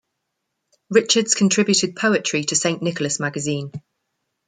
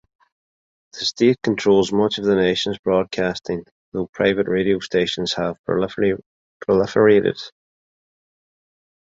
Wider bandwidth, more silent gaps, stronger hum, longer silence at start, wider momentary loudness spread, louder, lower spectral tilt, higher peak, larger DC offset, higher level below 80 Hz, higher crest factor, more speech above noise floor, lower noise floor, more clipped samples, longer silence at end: first, 9.6 kHz vs 7.8 kHz; second, none vs 2.79-2.83 s, 3.71-3.92 s, 4.09-4.13 s, 5.59-5.64 s, 6.26-6.60 s; neither; about the same, 0.9 s vs 0.95 s; second, 9 LU vs 13 LU; about the same, -19 LUFS vs -20 LUFS; second, -3 dB/octave vs -5.5 dB/octave; about the same, -2 dBFS vs -2 dBFS; neither; second, -66 dBFS vs -52 dBFS; about the same, 20 dB vs 18 dB; second, 57 dB vs over 71 dB; second, -77 dBFS vs under -90 dBFS; neither; second, 0.7 s vs 1.55 s